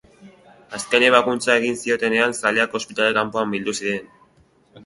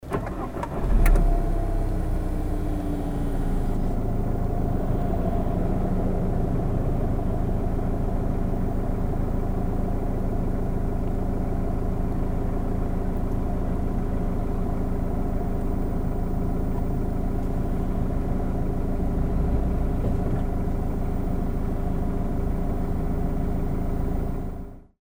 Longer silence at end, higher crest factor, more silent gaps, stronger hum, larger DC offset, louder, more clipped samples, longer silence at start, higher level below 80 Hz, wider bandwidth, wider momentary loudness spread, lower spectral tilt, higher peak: second, 0.05 s vs 0.25 s; about the same, 22 dB vs 18 dB; neither; neither; neither; first, -19 LUFS vs -28 LUFS; neither; first, 0.2 s vs 0 s; second, -62 dBFS vs -26 dBFS; second, 11.5 kHz vs over 20 kHz; first, 11 LU vs 3 LU; second, -3 dB/octave vs -9 dB/octave; first, 0 dBFS vs -6 dBFS